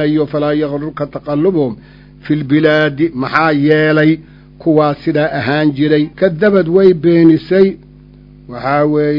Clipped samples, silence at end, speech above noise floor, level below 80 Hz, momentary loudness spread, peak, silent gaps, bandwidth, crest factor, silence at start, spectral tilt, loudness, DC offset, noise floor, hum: 0.2%; 0 s; 27 dB; -44 dBFS; 11 LU; 0 dBFS; none; 6 kHz; 12 dB; 0 s; -9 dB/octave; -13 LUFS; under 0.1%; -39 dBFS; 50 Hz at -35 dBFS